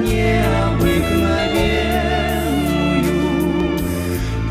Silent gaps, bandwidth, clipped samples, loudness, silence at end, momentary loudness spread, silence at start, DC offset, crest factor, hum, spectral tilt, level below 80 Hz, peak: none; 16 kHz; under 0.1%; -18 LUFS; 0 s; 5 LU; 0 s; under 0.1%; 14 dB; none; -6 dB/octave; -26 dBFS; -4 dBFS